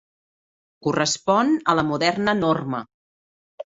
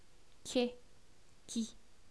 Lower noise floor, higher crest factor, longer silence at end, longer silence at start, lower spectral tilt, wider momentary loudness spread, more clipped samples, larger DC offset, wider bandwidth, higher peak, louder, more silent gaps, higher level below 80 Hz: first, under -90 dBFS vs -65 dBFS; about the same, 20 dB vs 22 dB; second, 0.15 s vs 0.35 s; first, 0.85 s vs 0.45 s; about the same, -4.5 dB/octave vs -3.5 dB/octave; second, 10 LU vs 22 LU; neither; second, under 0.1% vs 0.2%; second, 7.8 kHz vs 11 kHz; first, -4 dBFS vs -20 dBFS; first, -21 LUFS vs -40 LUFS; first, 2.94-3.58 s vs none; first, -58 dBFS vs -68 dBFS